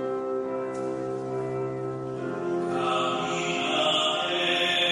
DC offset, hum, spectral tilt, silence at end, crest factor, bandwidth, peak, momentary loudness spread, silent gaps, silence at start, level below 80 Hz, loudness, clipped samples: under 0.1%; none; -3.5 dB/octave; 0 s; 16 dB; 12 kHz; -12 dBFS; 9 LU; none; 0 s; -66 dBFS; -27 LUFS; under 0.1%